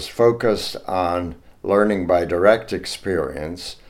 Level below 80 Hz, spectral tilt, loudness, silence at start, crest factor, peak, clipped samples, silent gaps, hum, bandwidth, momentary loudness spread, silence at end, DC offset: -46 dBFS; -5.5 dB/octave; -20 LUFS; 0 s; 18 dB; -2 dBFS; under 0.1%; none; none; 16 kHz; 12 LU; 0.15 s; under 0.1%